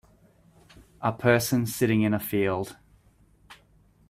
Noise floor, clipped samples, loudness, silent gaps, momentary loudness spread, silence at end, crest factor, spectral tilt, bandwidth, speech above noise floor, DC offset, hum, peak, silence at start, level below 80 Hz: -60 dBFS; under 0.1%; -25 LUFS; none; 9 LU; 0.55 s; 22 dB; -5.5 dB/octave; 16 kHz; 36 dB; under 0.1%; none; -6 dBFS; 1 s; -58 dBFS